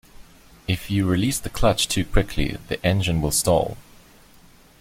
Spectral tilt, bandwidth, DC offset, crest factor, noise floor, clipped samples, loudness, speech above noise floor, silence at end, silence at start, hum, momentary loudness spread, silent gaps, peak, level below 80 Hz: -4.5 dB/octave; 16.5 kHz; under 0.1%; 18 dB; -51 dBFS; under 0.1%; -22 LUFS; 30 dB; 1 s; 0.2 s; none; 8 LU; none; -4 dBFS; -34 dBFS